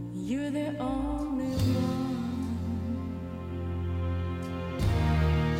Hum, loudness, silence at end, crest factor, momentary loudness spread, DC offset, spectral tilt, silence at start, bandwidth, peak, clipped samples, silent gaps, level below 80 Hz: none; -31 LUFS; 0 s; 14 dB; 8 LU; under 0.1%; -7.5 dB/octave; 0 s; 16 kHz; -16 dBFS; under 0.1%; none; -38 dBFS